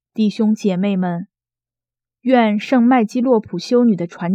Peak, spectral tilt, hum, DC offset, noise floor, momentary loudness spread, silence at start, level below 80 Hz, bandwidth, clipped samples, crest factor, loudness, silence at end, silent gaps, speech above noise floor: 0 dBFS; -7 dB/octave; none; under 0.1%; -89 dBFS; 7 LU; 0.15 s; -68 dBFS; 8.2 kHz; under 0.1%; 16 dB; -17 LUFS; 0 s; none; 73 dB